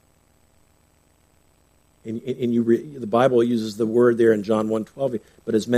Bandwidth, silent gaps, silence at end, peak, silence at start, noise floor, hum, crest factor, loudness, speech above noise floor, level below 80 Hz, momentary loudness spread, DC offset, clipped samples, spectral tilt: 13.5 kHz; none; 0 s; -4 dBFS; 2.05 s; -60 dBFS; 60 Hz at -45 dBFS; 18 dB; -21 LUFS; 40 dB; -64 dBFS; 13 LU; under 0.1%; under 0.1%; -7 dB/octave